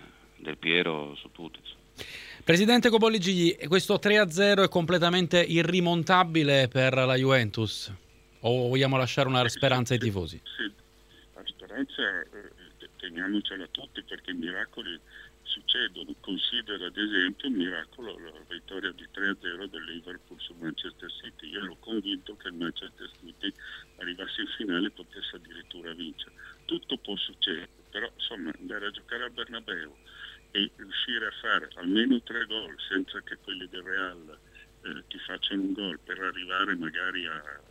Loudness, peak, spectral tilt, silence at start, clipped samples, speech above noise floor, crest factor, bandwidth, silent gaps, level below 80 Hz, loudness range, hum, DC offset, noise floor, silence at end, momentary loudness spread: -28 LUFS; -8 dBFS; -5 dB/octave; 0 s; under 0.1%; 28 dB; 22 dB; 16 kHz; none; -60 dBFS; 13 LU; none; under 0.1%; -57 dBFS; 0.15 s; 19 LU